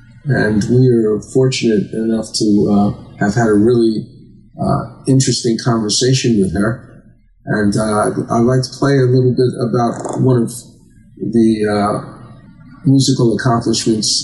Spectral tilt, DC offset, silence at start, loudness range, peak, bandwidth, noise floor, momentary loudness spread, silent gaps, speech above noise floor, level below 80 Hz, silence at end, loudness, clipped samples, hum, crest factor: -5.5 dB/octave; under 0.1%; 0.25 s; 2 LU; -2 dBFS; 12 kHz; -45 dBFS; 7 LU; none; 31 dB; -44 dBFS; 0 s; -14 LUFS; under 0.1%; none; 14 dB